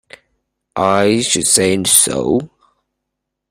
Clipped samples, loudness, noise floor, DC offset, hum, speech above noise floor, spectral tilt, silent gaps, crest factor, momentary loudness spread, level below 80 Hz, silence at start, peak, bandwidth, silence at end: under 0.1%; -13 LUFS; -77 dBFS; under 0.1%; none; 63 dB; -2.5 dB/octave; none; 16 dB; 8 LU; -50 dBFS; 0.75 s; 0 dBFS; 16 kHz; 1.05 s